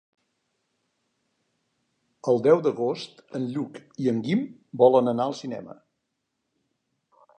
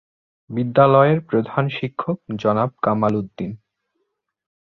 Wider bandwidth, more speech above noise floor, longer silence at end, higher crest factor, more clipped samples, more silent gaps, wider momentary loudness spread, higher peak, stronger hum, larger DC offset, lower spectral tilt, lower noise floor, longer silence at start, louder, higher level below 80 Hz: first, 9.2 kHz vs 6.2 kHz; about the same, 55 dB vs 55 dB; first, 1.65 s vs 1.15 s; about the same, 22 dB vs 18 dB; neither; neither; about the same, 17 LU vs 15 LU; second, -6 dBFS vs -2 dBFS; neither; neither; second, -7.5 dB/octave vs -9 dB/octave; first, -79 dBFS vs -74 dBFS; first, 2.25 s vs 0.5 s; second, -24 LUFS vs -19 LUFS; second, -78 dBFS vs -58 dBFS